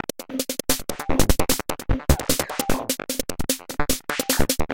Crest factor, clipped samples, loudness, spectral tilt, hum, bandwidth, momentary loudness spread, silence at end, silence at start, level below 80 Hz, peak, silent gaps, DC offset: 20 dB; under 0.1%; -24 LUFS; -3.5 dB/octave; none; 17 kHz; 6 LU; 0 s; 0.2 s; -30 dBFS; -4 dBFS; none; under 0.1%